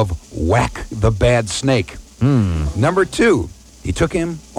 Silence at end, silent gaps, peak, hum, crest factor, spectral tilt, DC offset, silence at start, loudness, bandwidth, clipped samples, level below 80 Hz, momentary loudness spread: 0 s; none; -2 dBFS; none; 16 dB; -6 dB/octave; under 0.1%; 0 s; -17 LUFS; 13 kHz; under 0.1%; -30 dBFS; 8 LU